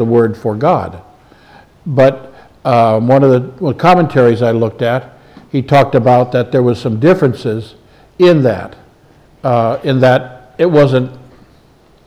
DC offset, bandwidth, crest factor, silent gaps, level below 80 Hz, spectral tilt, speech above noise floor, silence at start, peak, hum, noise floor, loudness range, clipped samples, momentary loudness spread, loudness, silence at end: under 0.1%; 12 kHz; 12 dB; none; -48 dBFS; -8 dB/octave; 36 dB; 0 s; 0 dBFS; none; -47 dBFS; 3 LU; under 0.1%; 12 LU; -12 LUFS; 0.85 s